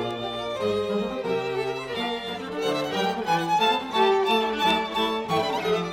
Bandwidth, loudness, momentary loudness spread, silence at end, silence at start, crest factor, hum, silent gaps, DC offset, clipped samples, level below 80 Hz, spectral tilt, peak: 17 kHz; -25 LUFS; 7 LU; 0 s; 0 s; 16 dB; none; none; under 0.1%; under 0.1%; -58 dBFS; -4.5 dB/octave; -10 dBFS